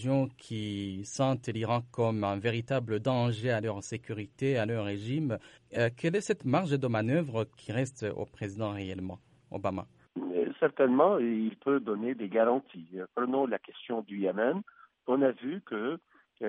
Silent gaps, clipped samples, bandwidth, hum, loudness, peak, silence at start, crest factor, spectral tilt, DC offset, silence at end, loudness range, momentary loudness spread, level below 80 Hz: none; under 0.1%; 11.5 kHz; none; -31 LUFS; -10 dBFS; 0 s; 20 dB; -6.5 dB/octave; under 0.1%; 0 s; 4 LU; 11 LU; -70 dBFS